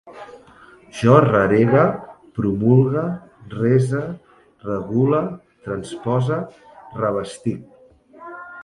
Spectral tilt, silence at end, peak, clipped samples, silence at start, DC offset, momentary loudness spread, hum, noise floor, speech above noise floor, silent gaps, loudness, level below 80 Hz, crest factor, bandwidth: -8 dB/octave; 0 s; 0 dBFS; under 0.1%; 0.05 s; under 0.1%; 21 LU; none; -48 dBFS; 30 dB; none; -19 LUFS; -52 dBFS; 20 dB; 11.5 kHz